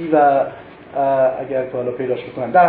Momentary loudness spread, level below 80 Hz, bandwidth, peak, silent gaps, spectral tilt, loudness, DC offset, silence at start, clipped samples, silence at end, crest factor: 11 LU; -58 dBFS; 4.3 kHz; -2 dBFS; none; -11 dB/octave; -19 LUFS; under 0.1%; 0 s; under 0.1%; 0 s; 16 dB